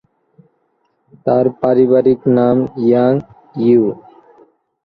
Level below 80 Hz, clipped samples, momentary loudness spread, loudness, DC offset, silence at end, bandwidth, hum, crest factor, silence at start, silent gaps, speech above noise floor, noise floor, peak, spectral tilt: -54 dBFS; under 0.1%; 9 LU; -14 LUFS; under 0.1%; 0.85 s; 5 kHz; none; 14 dB; 1.25 s; none; 51 dB; -63 dBFS; -2 dBFS; -11 dB/octave